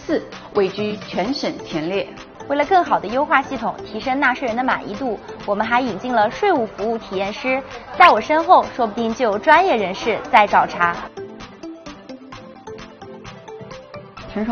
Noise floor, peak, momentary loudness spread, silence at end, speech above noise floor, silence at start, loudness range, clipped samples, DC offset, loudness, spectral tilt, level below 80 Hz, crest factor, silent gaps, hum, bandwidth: -38 dBFS; 0 dBFS; 23 LU; 0 s; 20 dB; 0 s; 7 LU; under 0.1%; under 0.1%; -18 LUFS; -2.5 dB/octave; -50 dBFS; 20 dB; none; none; 7 kHz